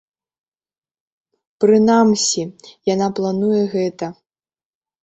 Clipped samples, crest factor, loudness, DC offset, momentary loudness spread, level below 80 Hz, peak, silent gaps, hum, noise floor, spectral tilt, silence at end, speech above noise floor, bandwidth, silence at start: under 0.1%; 16 dB; -17 LUFS; under 0.1%; 14 LU; -62 dBFS; -2 dBFS; none; none; under -90 dBFS; -4.5 dB/octave; 0.9 s; over 74 dB; 8.2 kHz; 1.6 s